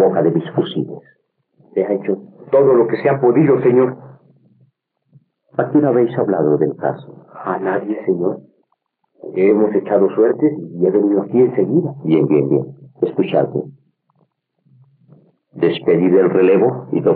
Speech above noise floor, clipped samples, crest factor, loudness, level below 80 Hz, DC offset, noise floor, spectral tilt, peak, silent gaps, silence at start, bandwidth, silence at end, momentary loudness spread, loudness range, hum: 53 dB; under 0.1%; 14 dB; -16 LUFS; -74 dBFS; under 0.1%; -68 dBFS; -7.5 dB/octave; -4 dBFS; none; 0 s; 4.3 kHz; 0 s; 12 LU; 5 LU; none